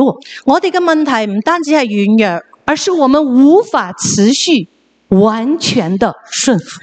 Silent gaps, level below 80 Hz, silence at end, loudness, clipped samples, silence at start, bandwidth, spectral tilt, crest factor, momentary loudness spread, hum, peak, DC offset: none; -50 dBFS; 0.05 s; -12 LUFS; under 0.1%; 0 s; 9.2 kHz; -4.5 dB/octave; 12 dB; 7 LU; none; 0 dBFS; under 0.1%